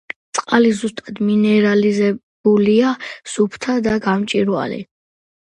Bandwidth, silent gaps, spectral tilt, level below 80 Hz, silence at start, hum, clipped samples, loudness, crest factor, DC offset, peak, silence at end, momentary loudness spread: 10.5 kHz; 2.23-2.44 s; -5.5 dB/octave; -54 dBFS; 0.35 s; none; under 0.1%; -17 LUFS; 16 dB; under 0.1%; 0 dBFS; 0.75 s; 11 LU